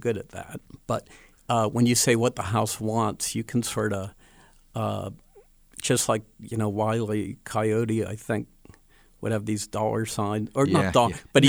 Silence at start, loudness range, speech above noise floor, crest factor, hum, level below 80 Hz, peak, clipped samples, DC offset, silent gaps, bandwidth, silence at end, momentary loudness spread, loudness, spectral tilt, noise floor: 0.05 s; 4 LU; 31 dB; 22 dB; none; -54 dBFS; -4 dBFS; under 0.1%; under 0.1%; none; over 20 kHz; 0 s; 13 LU; -26 LUFS; -4.5 dB/octave; -56 dBFS